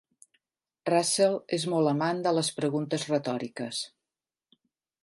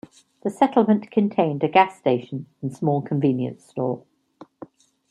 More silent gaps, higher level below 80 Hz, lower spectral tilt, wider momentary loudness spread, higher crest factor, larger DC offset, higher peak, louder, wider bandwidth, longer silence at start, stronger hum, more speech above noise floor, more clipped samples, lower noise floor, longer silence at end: neither; second, -78 dBFS vs -68 dBFS; second, -4.5 dB/octave vs -8 dB/octave; second, 9 LU vs 13 LU; about the same, 20 dB vs 20 dB; neither; second, -10 dBFS vs -2 dBFS; second, -28 LUFS vs -22 LUFS; about the same, 11.5 kHz vs 11 kHz; first, 0.85 s vs 0.45 s; neither; first, over 63 dB vs 28 dB; neither; first, under -90 dBFS vs -50 dBFS; first, 1.15 s vs 0.45 s